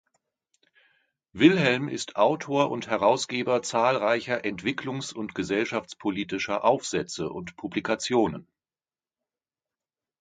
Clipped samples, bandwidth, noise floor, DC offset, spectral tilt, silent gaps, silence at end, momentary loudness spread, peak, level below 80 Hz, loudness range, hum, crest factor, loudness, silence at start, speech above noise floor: under 0.1%; 9.4 kHz; under -90 dBFS; under 0.1%; -4.5 dB/octave; none; 1.8 s; 10 LU; -4 dBFS; -62 dBFS; 5 LU; none; 24 dB; -26 LUFS; 1.35 s; over 64 dB